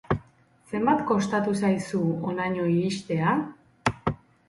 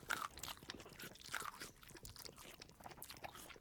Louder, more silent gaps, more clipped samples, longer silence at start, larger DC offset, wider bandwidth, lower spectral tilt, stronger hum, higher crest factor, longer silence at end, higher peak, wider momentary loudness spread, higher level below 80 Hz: first, -26 LUFS vs -51 LUFS; neither; neither; about the same, 0.1 s vs 0 s; neither; second, 11.5 kHz vs 19.5 kHz; first, -6.5 dB/octave vs -1.5 dB/octave; neither; second, 20 dB vs 30 dB; first, 0.35 s vs 0 s; first, -8 dBFS vs -22 dBFS; second, 7 LU vs 11 LU; first, -52 dBFS vs -70 dBFS